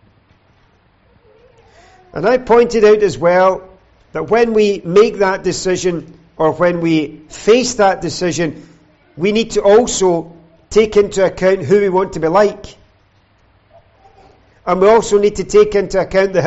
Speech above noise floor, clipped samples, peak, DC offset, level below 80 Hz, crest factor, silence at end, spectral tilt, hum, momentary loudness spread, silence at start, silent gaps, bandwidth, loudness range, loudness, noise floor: 40 dB; under 0.1%; -2 dBFS; under 0.1%; -42 dBFS; 14 dB; 0 s; -5 dB/octave; none; 9 LU; 2.15 s; none; 8.2 kHz; 3 LU; -13 LUFS; -53 dBFS